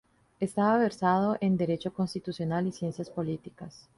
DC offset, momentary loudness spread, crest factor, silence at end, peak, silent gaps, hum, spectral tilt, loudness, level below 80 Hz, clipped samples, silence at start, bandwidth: under 0.1%; 10 LU; 18 dB; 0.2 s; -12 dBFS; none; none; -7.5 dB/octave; -29 LUFS; -64 dBFS; under 0.1%; 0.4 s; 11.5 kHz